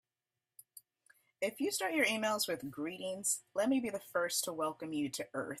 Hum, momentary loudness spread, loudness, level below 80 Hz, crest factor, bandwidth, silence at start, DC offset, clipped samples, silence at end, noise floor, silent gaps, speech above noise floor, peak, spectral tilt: none; 9 LU; -36 LUFS; -80 dBFS; 20 dB; 16 kHz; 0.75 s; under 0.1%; under 0.1%; 0 s; under -90 dBFS; none; over 54 dB; -18 dBFS; -2.5 dB/octave